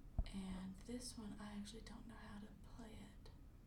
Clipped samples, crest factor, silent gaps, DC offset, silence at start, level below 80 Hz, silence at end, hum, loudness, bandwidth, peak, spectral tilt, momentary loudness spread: under 0.1%; 22 dB; none; under 0.1%; 0 s; -56 dBFS; 0 s; none; -54 LUFS; 18 kHz; -30 dBFS; -5 dB/octave; 10 LU